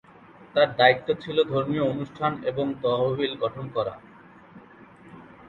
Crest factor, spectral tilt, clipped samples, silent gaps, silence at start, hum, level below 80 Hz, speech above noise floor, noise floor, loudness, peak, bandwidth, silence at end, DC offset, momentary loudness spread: 24 dB; -7.5 dB/octave; under 0.1%; none; 0.4 s; none; -62 dBFS; 26 dB; -50 dBFS; -25 LUFS; -2 dBFS; 7.2 kHz; 0 s; under 0.1%; 10 LU